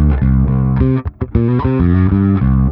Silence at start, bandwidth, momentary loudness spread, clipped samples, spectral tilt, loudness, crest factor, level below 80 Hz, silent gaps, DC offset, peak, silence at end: 0 s; 4.2 kHz; 4 LU; under 0.1%; -13 dB/octave; -14 LUFS; 12 dB; -20 dBFS; none; under 0.1%; 0 dBFS; 0 s